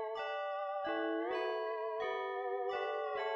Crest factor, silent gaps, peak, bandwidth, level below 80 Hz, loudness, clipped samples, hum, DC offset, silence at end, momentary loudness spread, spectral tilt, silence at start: 12 dB; none; -26 dBFS; 7.4 kHz; -82 dBFS; -38 LUFS; under 0.1%; none; under 0.1%; 0 s; 2 LU; -4 dB/octave; 0 s